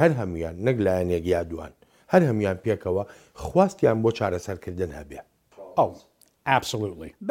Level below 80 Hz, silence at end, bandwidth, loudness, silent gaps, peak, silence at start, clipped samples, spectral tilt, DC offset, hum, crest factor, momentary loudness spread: -50 dBFS; 0 s; 16.5 kHz; -25 LUFS; none; -4 dBFS; 0 s; under 0.1%; -6.5 dB/octave; under 0.1%; none; 22 dB; 16 LU